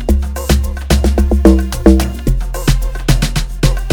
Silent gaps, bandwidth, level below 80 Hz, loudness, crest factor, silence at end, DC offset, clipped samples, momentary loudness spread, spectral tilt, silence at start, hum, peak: none; 19.5 kHz; -14 dBFS; -14 LUFS; 12 dB; 0 s; under 0.1%; 0.4%; 7 LU; -6 dB/octave; 0 s; none; 0 dBFS